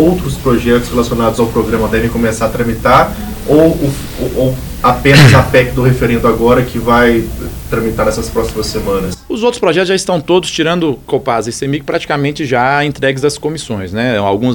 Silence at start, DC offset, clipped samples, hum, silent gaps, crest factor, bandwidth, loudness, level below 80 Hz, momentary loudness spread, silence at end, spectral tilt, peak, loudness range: 0 s; under 0.1%; 0.5%; none; none; 12 dB; over 20 kHz; -12 LUFS; -28 dBFS; 8 LU; 0 s; -5.5 dB/octave; 0 dBFS; 5 LU